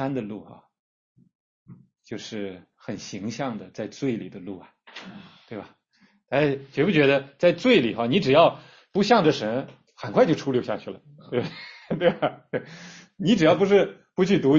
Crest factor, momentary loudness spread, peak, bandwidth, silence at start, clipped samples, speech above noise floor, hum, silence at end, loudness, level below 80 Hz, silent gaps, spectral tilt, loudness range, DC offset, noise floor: 20 dB; 22 LU; -4 dBFS; 7.6 kHz; 0 s; under 0.1%; 40 dB; none; 0 s; -23 LUFS; -62 dBFS; 0.79-1.15 s, 1.35-1.66 s; -6 dB/octave; 14 LU; under 0.1%; -63 dBFS